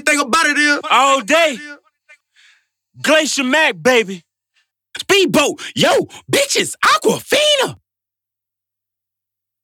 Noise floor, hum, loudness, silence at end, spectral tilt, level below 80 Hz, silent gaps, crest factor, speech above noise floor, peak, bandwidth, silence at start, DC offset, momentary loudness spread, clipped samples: -84 dBFS; none; -14 LUFS; 1.9 s; -2 dB/octave; -60 dBFS; none; 14 dB; 70 dB; -2 dBFS; 19.5 kHz; 0.05 s; under 0.1%; 10 LU; under 0.1%